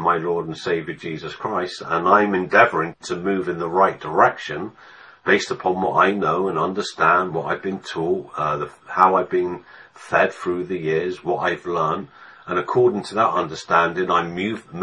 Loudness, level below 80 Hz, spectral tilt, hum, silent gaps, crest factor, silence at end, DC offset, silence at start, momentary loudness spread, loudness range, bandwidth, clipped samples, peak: -21 LUFS; -60 dBFS; -5.5 dB/octave; none; none; 20 dB; 0 s; under 0.1%; 0 s; 11 LU; 3 LU; 10 kHz; under 0.1%; 0 dBFS